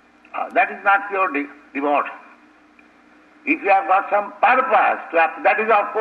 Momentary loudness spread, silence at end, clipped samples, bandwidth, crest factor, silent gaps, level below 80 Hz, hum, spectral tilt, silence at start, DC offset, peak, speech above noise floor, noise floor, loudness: 12 LU; 0 s; under 0.1%; 5.4 kHz; 16 dB; none; -70 dBFS; none; -5.5 dB/octave; 0.35 s; under 0.1%; -4 dBFS; 33 dB; -51 dBFS; -18 LUFS